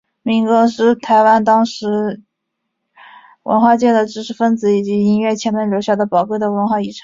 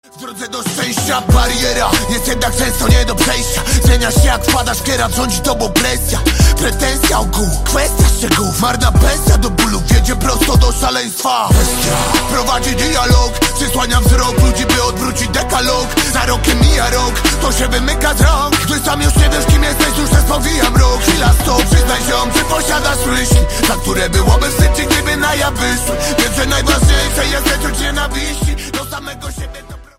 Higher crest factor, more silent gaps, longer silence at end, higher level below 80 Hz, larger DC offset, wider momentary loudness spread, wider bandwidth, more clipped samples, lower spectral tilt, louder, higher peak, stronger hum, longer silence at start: about the same, 14 dB vs 12 dB; neither; about the same, 0.05 s vs 0.15 s; second, -60 dBFS vs -16 dBFS; neither; first, 8 LU vs 5 LU; second, 7.6 kHz vs 16.5 kHz; neither; first, -6 dB/octave vs -4 dB/octave; about the same, -15 LUFS vs -13 LUFS; about the same, -2 dBFS vs 0 dBFS; neither; about the same, 0.25 s vs 0.15 s